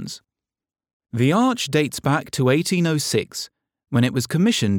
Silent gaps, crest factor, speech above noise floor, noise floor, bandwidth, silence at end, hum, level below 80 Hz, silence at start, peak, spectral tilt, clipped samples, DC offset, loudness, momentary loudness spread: 0.93-1.00 s; 16 dB; 64 dB; -84 dBFS; 19 kHz; 0 s; none; -60 dBFS; 0 s; -6 dBFS; -5 dB/octave; under 0.1%; under 0.1%; -20 LUFS; 13 LU